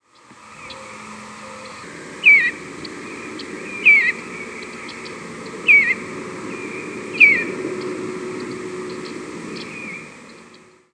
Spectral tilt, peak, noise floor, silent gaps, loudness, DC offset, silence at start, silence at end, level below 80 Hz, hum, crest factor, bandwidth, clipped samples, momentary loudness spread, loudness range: -3.5 dB/octave; 0 dBFS; -47 dBFS; none; -14 LUFS; under 0.1%; 0.3 s; 0.35 s; -64 dBFS; none; 22 dB; 11 kHz; under 0.1%; 24 LU; 3 LU